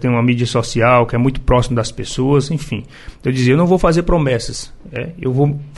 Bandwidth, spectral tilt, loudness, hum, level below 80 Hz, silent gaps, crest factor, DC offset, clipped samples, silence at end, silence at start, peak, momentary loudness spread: 11.5 kHz; -6.5 dB/octave; -16 LUFS; none; -28 dBFS; none; 14 dB; under 0.1%; under 0.1%; 0 s; 0 s; -2 dBFS; 14 LU